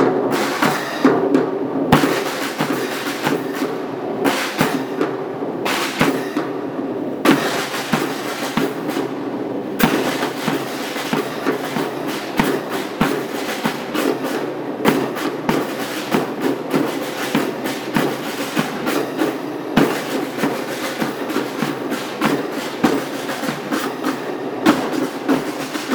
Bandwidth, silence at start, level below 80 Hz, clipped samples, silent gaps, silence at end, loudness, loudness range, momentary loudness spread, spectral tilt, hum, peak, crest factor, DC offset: over 20 kHz; 0 s; -52 dBFS; under 0.1%; none; 0 s; -20 LUFS; 2 LU; 7 LU; -4.5 dB/octave; none; -2 dBFS; 18 dB; under 0.1%